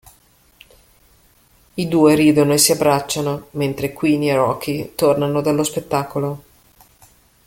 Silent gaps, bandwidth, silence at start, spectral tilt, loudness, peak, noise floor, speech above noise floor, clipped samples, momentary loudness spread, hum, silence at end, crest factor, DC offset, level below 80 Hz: none; 17 kHz; 1.75 s; -4.5 dB/octave; -17 LUFS; 0 dBFS; -54 dBFS; 37 dB; under 0.1%; 11 LU; none; 1.05 s; 18 dB; under 0.1%; -52 dBFS